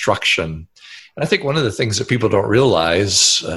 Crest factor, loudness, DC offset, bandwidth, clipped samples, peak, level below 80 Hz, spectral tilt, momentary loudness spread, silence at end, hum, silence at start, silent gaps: 16 dB; -16 LUFS; under 0.1%; 12.5 kHz; under 0.1%; -2 dBFS; -42 dBFS; -3.5 dB/octave; 13 LU; 0 s; none; 0 s; none